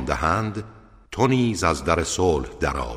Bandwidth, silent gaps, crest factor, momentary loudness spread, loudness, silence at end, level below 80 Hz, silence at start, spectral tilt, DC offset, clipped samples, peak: 15.5 kHz; none; 18 dB; 13 LU; -22 LUFS; 0 s; -36 dBFS; 0 s; -5 dB/octave; under 0.1%; under 0.1%; -4 dBFS